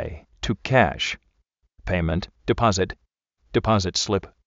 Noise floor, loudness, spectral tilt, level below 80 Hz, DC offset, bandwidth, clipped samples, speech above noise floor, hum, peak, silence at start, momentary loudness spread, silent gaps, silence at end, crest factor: -69 dBFS; -23 LUFS; -4 dB/octave; -40 dBFS; under 0.1%; 8 kHz; under 0.1%; 47 dB; none; -4 dBFS; 0 s; 14 LU; none; 0.2 s; 20 dB